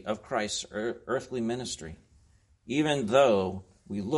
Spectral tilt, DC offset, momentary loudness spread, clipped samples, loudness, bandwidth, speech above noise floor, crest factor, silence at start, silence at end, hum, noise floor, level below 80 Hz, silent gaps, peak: -4.5 dB/octave; under 0.1%; 16 LU; under 0.1%; -29 LUFS; 11.5 kHz; 34 dB; 20 dB; 0.05 s; 0 s; none; -63 dBFS; -60 dBFS; none; -10 dBFS